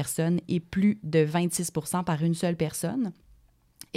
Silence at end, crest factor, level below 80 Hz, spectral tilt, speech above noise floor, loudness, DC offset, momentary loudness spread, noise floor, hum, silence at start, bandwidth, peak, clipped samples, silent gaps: 0.15 s; 18 dB; -60 dBFS; -6 dB/octave; 33 dB; -27 LUFS; under 0.1%; 5 LU; -60 dBFS; none; 0 s; 16 kHz; -10 dBFS; under 0.1%; none